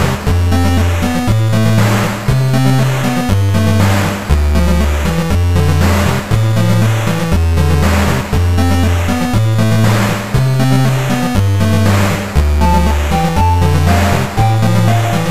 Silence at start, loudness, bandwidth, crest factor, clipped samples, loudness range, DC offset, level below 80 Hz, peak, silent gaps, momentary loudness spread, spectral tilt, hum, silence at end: 0 s; -13 LUFS; 15.5 kHz; 12 dB; under 0.1%; 1 LU; 7%; -20 dBFS; 0 dBFS; none; 3 LU; -6 dB/octave; none; 0 s